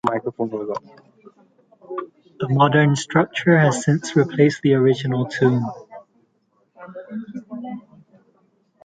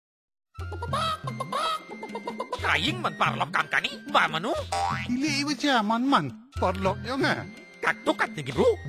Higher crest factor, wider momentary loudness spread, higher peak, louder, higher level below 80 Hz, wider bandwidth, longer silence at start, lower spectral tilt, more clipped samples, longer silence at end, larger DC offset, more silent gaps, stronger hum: about the same, 20 dB vs 20 dB; first, 18 LU vs 11 LU; first, -2 dBFS vs -8 dBFS; first, -19 LUFS vs -27 LUFS; second, -62 dBFS vs -46 dBFS; second, 9.4 kHz vs 16 kHz; second, 0.05 s vs 0.55 s; first, -6.5 dB/octave vs -4.5 dB/octave; neither; first, 1.05 s vs 0 s; neither; neither; neither